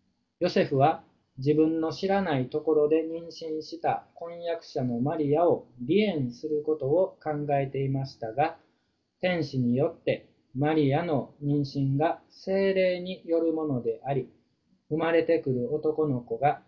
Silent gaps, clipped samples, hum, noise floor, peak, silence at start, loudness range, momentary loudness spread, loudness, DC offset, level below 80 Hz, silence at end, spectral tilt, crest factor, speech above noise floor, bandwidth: none; under 0.1%; none; -74 dBFS; -8 dBFS; 0.4 s; 3 LU; 10 LU; -28 LUFS; under 0.1%; -62 dBFS; 0.1 s; -8 dB/octave; 18 dB; 47 dB; 7 kHz